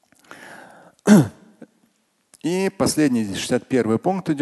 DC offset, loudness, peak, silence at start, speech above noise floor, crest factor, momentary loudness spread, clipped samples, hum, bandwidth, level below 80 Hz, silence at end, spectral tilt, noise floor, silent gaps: under 0.1%; -20 LUFS; 0 dBFS; 0.3 s; 44 dB; 20 dB; 17 LU; under 0.1%; none; 12.5 kHz; -54 dBFS; 0 s; -5.5 dB/octave; -64 dBFS; none